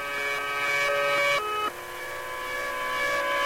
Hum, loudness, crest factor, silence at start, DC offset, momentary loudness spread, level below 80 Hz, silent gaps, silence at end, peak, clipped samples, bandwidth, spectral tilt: none; -26 LUFS; 12 dB; 0 s; under 0.1%; 10 LU; -56 dBFS; none; 0 s; -16 dBFS; under 0.1%; 16 kHz; -1.5 dB/octave